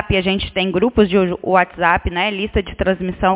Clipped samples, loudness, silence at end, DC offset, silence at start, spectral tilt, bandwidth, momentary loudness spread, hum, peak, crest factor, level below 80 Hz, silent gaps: under 0.1%; -17 LUFS; 0 s; under 0.1%; 0 s; -10 dB/octave; 4 kHz; 5 LU; none; 0 dBFS; 16 dB; -32 dBFS; none